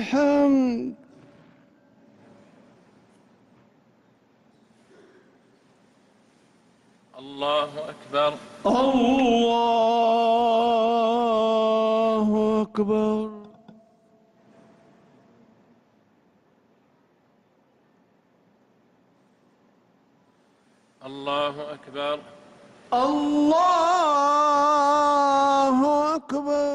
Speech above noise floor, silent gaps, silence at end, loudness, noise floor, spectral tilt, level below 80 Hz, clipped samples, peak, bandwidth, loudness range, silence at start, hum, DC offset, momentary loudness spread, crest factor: 42 dB; none; 0 s; -22 LUFS; -63 dBFS; -5 dB/octave; -62 dBFS; under 0.1%; -10 dBFS; 11.5 kHz; 14 LU; 0 s; none; under 0.1%; 11 LU; 14 dB